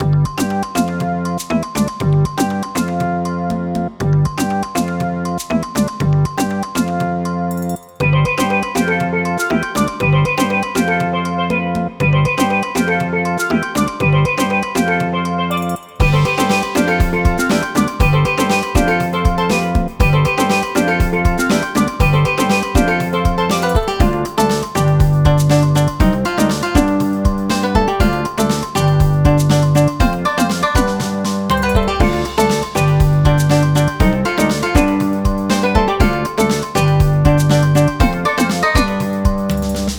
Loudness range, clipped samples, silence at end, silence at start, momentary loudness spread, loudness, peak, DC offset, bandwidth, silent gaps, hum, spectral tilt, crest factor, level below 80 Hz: 4 LU; under 0.1%; 0 s; 0 s; 6 LU; -16 LUFS; 0 dBFS; under 0.1%; 19 kHz; none; none; -6 dB/octave; 14 dB; -24 dBFS